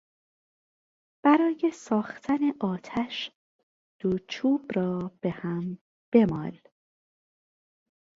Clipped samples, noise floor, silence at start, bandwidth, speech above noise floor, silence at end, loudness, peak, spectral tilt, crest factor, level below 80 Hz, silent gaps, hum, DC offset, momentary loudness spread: under 0.1%; under -90 dBFS; 1.25 s; 7.8 kHz; over 63 dB; 1.65 s; -27 LUFS; -8 dBFS; -7 dB/octave; 22 dB; -64 dBFS; 3.35-3.99 s, 5.81-6.12 s; none; under 0.1%; 12 LU